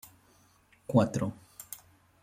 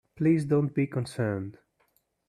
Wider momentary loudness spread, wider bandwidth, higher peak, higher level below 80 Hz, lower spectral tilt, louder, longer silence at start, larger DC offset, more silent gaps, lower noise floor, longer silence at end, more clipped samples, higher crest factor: first, 21 LU vs 9 LU; first, 16.5 kHz vs 13 kHz; about the same, -10 dBFS vs -12 dBFS; about the same, -66 dBFS vs -66 dBFS; about the same, -7 dB/octave vs -8 dB/octave; about the same, -29 LUFS vs -28 LUFS; first, 0.9 s vs 0.15 s; neither; neither; second, -64 dBFS vs -71 dBFS; second, 0.45 s vs 0.75 s; neither; first, 24 dB vs 16 dB